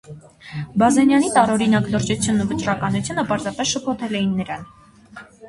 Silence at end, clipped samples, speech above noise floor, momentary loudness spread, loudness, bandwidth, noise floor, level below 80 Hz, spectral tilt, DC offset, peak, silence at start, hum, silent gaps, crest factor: 0 s; under 0.1%; 23 dB; 13 LU; -19 LUFS; 11.5 kHz; -43 dBFS; -50 dBFS; -5 dB/octave; under 0.1%; -2 dBFS; 0.1 s; none; none; 18 dB